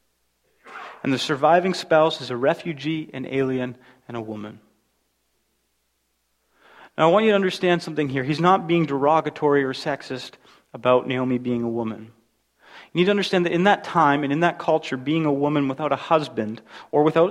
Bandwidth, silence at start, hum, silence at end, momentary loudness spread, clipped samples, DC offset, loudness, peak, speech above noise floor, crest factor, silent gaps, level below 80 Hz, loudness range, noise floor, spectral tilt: 12.5 kHz; 0.65 s; none; 0 s; 15 LU; under 0.1%; under 0.1%; -22 LUFS; -2 dBFS; 50 dB; 20 dB; none; -64 dBFS; 9 LU; -71 dBFS; -6 dB/octave